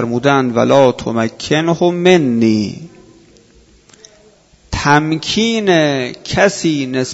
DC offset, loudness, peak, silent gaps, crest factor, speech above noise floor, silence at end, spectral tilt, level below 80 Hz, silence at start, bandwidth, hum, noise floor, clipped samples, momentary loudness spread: under 0.1%; -14 LUFS; 0 dBFS; none; 14 dB; 35 dB; 0 s; -5 dB/octave; -42 dBFS; 0 s; 8 kHz; none; -48 dBFS; under 0.1%; 8 LU